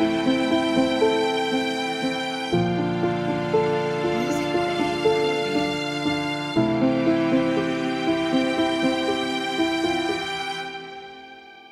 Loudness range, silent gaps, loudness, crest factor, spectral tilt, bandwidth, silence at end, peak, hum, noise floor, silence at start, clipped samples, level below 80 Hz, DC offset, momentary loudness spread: 1 LU; none; -23 LUFS; 16 dB; -5.5 dB/octave; 13 kHz; 0.05 s; -8 dBFS; none; -44 dBFS; 0 s; under 0.1%; -54 dBFS; under 0.1%; 6 LU